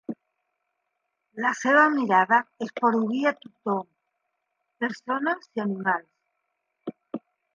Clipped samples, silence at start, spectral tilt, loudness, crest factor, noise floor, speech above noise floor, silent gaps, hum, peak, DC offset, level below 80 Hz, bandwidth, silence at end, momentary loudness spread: under 0.1%; 0.1 s; -5.5 dB/octave; -24 LUFS; 20 dB; -79 dBFS; 55 dB; none; none; -6 dBFS; under 0.1%; -82 dBFS; 7.6 kHz; 0.35 s; 20 LU